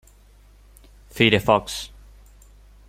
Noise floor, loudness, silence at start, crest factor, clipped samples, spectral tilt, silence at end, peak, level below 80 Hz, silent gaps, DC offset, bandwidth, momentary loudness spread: -51 dBFS; -20 LUFS; 1.15 s; 24 dB; under 0.1%; -4.5 dB/octave; 1.05 s; -2 dBFS; -48 dBFS; none; under 0.1%; 16.5 kHz; 22 LU